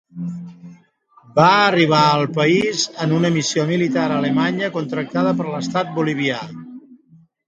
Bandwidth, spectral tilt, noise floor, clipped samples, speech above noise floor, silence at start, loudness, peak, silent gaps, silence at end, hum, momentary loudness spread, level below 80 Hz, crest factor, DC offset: 9.2 kHz; -5 dB/octave; -53 dBFS; under 0.1%; 36 dB; 0.15 s; -18 LUFS; 0 dBFS; none; 0.55 s; none; 16 LU; -62 dBFS; 18 dB; under 0.1%